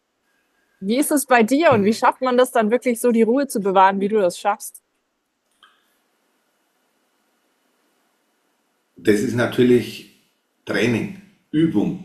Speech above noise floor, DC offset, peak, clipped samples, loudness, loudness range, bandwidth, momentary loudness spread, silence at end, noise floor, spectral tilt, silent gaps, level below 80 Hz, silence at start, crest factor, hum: 54 dB; under 0.1%; -2 dBFS; under 0.1%; -18 LUFS; 11 LU; 14 kHz; 11 LU; 0 s; -72 dBFS; -5 dB/octave; none; -60 dBFS; 0.8 s; 18 dB; none